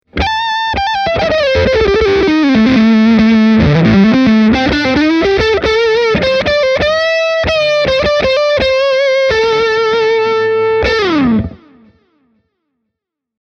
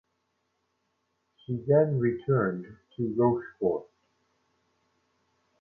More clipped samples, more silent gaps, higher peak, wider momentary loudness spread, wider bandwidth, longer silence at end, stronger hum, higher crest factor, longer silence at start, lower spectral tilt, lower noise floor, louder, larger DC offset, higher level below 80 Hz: neither; neither; first, 0 dBFS vs -12 dBFS; second, 5 LU vs 13 LU; first, 7 kHz vs 3.4 kHz; about the same, 1.85 s vs 1.75 s; neither; second, 10 dB vs 20 dB; second, 0.15 s vs 1.5 s; second, -6 dB/octave vs -11.5 dB/octave; about the same, -77 dBFS vs -77 dBFS; first, -11 LUFS vs -28 LUFS; neither; first, -30 dBFS vs -64 dBFS